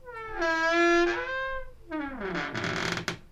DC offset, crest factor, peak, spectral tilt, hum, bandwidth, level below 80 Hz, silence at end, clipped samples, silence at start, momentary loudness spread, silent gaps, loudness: under 0.1%; 14 dB; -14 dBFS; -4.5 dB/octave; none; 13 kHz; -48 dBFS; 0.05 s; under 0.1%; 0.05 s; 14 LU; none; -28 LUFS